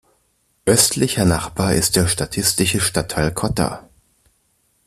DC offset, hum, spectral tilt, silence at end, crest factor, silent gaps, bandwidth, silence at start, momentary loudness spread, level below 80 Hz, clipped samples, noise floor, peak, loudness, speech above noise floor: under 0.1%; none; -3.5 dB/octave; 1.05 s; 20 dB; none; 15 kHz; 0.65 s; 8 LU; -40 dBFS; under 0.1%; -64 dBFS; 0 dBFS; -18 LUFS; 46 dB